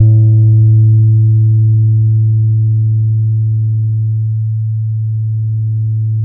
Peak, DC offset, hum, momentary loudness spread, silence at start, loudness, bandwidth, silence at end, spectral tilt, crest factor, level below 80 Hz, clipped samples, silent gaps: 0 dBFS; under 0.1%; none; 8 LU; 0 s; -12 LUFS; 0.7 kHz; 0 s; -19.5 dB/octave; 10 dB; -42 dBFS; under 0.1%; none